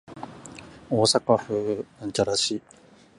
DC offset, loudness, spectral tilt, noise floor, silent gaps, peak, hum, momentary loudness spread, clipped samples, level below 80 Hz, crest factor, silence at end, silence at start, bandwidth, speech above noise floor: under 0.1%; -24 LUFS; -4 dB/octave; -44 dBFS; none; -6 dBFS; none; 21 LU; under 0.1%; -60 dBFS; 22 dB; 0.6 s; 0.1 s; 11.5 kHz; 20 dB